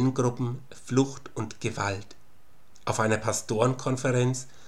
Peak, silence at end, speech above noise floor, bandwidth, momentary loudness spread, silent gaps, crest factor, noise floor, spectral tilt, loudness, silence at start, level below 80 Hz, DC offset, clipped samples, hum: -8 dBFS; 0.25 s; 33 dB; 13 kHz; 11 LU; none; 20 dB; -61 dBFS; -5.5 dB/octave; -28 LUFS; 0 s; -62 dBFS; 0.8%; under 0.1%; none